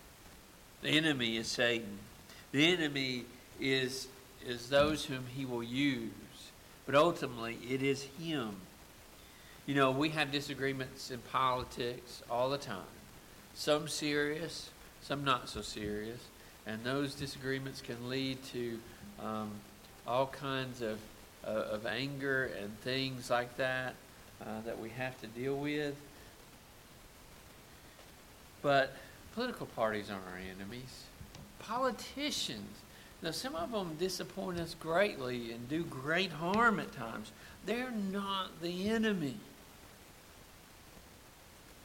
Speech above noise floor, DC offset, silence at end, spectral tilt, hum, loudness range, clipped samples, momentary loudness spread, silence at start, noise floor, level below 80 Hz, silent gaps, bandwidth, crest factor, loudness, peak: 21 dB; under 0.1%; 0 s; -4.5 dB/octave; none; 6 LU; under 0.1%; 24 LU; 0 s; -57 dBFS; -62 dBFS; none; 17 kHz; 22 dB; -36 LUFS; -16 dBFS